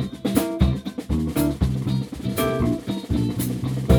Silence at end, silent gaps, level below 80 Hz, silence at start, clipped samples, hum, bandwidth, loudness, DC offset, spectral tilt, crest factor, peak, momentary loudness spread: 0 s; none; -32 dBFS; 0 s; under 0.1%; none; over 20 kHz; -24 LUFS; under 0.1%; -6.5 dB/octave; 20 dB; -2 dBFS; 5 LU